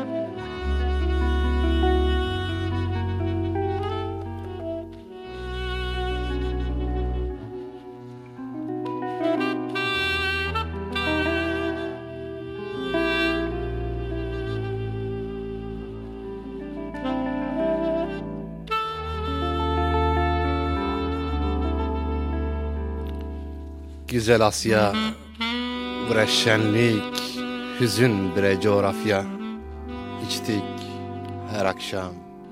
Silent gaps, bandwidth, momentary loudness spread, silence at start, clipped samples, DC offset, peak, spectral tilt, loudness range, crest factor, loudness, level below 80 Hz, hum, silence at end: none; 16 kHz; 14 LU; 0 s; under 0.1%; under 0.1%; -4 dBFS; -5.5 dB/octave; 8 LU; 22 dB; -26 LUFS; -32 dBFS; none; 0 s